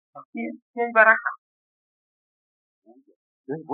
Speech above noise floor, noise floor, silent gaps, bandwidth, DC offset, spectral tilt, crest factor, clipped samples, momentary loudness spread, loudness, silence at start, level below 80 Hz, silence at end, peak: over 68 dB; under -90 dBFS; 0.25-0.33 s, 0.62-0.74 s, 1.38-2.82 s, 3.16-3.44 s; 4.4 kHz; under 0.1%; -3.5 dB/octave; 24 dB; under 0.1%; 21 LU; -19 LUFS; 0.15 s; under -90 dBFS; 0 s; -2 dBFS